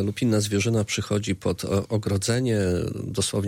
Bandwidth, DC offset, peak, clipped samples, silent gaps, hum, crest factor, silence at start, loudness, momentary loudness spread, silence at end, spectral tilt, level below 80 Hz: 16.5 kHz; under 0.1%; -12 dBFS; under 0.1%; none; none; 12 dB; 0 s; -25 LUFS; 4 LU; 0 s; -5 dB/octave; -50 dBFS